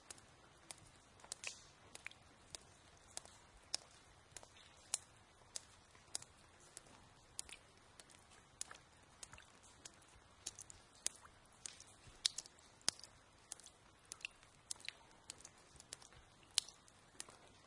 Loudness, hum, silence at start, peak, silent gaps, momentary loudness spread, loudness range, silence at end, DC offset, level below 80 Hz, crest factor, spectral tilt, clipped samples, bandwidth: -49 LUFS; none; 0 s; -12 dBFS; none; 22 LU; 10 LU; 0 s; under 0.1%; -76 dBFS; 40 dB; 0.5 dB/octave; under 0.1%; 12 kHz